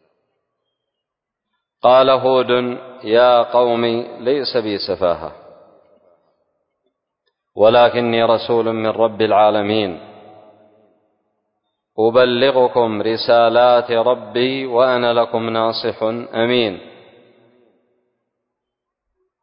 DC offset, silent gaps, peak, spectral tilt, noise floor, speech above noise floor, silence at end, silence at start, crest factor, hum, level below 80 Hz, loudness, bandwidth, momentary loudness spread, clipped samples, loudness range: under 0.1%; none; -2 dBFS; -10 dB/octave; -81 dBFS; 66 dB; 2.55 s; 1.85 s; 16 dB; none; -58 dBFS; -16 LUFS; 5.4 kHz; 10 LU; under 0.1%; 7 LU